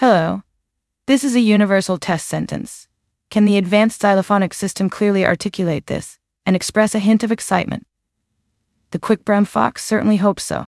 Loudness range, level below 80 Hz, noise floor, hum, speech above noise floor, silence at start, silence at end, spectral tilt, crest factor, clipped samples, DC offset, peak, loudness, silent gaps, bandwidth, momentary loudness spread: 3 LU; -54 dBFS; -75 dBFS; none; 59 dB; 0 s; 0.1 s; -5.5 dB/octave; 16 dB; under 0.1%; under 0.1%; -2 dBFS; -17 LUFS; none; 12 kHz; 12 LU